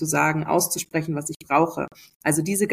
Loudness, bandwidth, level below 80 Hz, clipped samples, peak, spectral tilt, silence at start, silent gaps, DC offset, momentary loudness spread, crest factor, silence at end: -23 LUFS; 15.5 kHz; -60 dBFS; under 0.1%; -6 dBFS; -4.5 dB/octave; 0 s; 1.36-1.40 s, 2.15-2.20 s; under 0.1%; 8 LU; 18 dB; 0 s